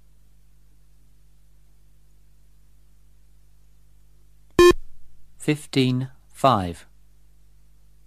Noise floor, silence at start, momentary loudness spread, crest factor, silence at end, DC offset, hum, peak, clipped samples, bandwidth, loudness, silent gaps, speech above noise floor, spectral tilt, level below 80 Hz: -57 dBFS; 4.6 s; 17 LU; 24 dB; 1.3 s; 0.3%; 50 Hz at -55 dBFS; -2 dBFS; under 0.1%; 15 kHz; -21 LUFS; none; 35 dB; -5.5 dB/octave; -44 dBFS